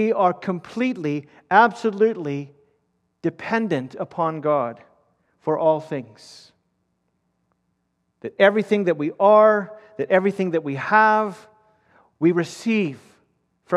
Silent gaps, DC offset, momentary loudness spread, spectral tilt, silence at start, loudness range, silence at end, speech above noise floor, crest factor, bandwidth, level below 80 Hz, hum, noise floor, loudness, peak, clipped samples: none; under 0.1%; 15 LU; -6.5 dB/octave; 0 s; 8 LU; 0 s; 52 dB; 20 dB; 11 kHz; -74 dBFS; none; -72 dBFS; -21 LUFS; -2 dBFS; under 0.1%